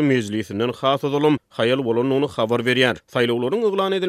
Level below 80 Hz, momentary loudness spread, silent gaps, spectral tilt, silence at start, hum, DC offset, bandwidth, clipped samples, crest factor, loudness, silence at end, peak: -62 dBFS; 3 LU; none; -6 dB/octave; 0 s; none; under 0.1%; 15 kHz; under 0.1%; 18 dB; -20 LUFS; 0 s; -2 dBFS